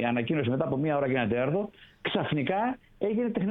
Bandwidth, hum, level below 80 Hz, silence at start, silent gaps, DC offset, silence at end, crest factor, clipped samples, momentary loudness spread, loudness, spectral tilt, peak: 4.1 kHz; none; -60 dBFS; 0 s; none; under 0.1%; 0 s; 14 dB; under 0.1%; 6 LU; -29 LUFS; -9.5 dB/octave; -14 dBFS